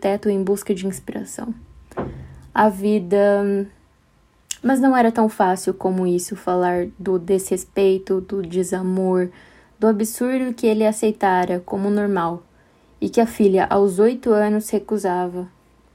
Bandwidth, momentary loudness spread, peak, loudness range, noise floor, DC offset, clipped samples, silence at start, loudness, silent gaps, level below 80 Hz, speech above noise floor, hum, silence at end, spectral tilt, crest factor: 16 kHz; 14 LU; -2 dBFS; 2 LU; -57 dBFS; under 0.1%; under 0.1%; 0 s; -20 LUFS; none; -52 dBFS; 38 dB; none; 0.45 s; -6 dB/octave; 18 dB